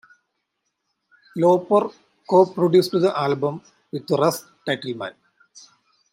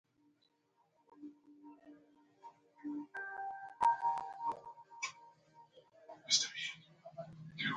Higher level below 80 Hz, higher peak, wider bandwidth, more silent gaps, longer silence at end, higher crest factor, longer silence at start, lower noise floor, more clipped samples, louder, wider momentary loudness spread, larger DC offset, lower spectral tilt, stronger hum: first, -72 dBFS vs -82 dBFS; first, -4 dBFS vs -16 dBFS; first, 16 kHz vs 10 kHz; neither; first, 1 s vs 0 s; second, 18 dB vs 26 dB; first, 1.35 s vs 1.15 s; about the same, -76 dBFS vs -77 dBFS; neither; first, -21 LUFS vs -38 LUFS; second, 17 LU vs 27 LU; neither; first, -6 dB/octave vs -1 dB/octave; neither